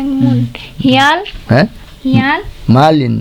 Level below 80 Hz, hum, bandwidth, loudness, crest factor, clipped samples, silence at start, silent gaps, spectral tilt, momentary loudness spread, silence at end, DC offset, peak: -34 dBFS; none; 14 kHz; -12 LUFS; 12 dB; under 0.1%; 0 s; none; -6.5 dB/octave; 8 LU; 0 s; under 0.1%; 0 dBFS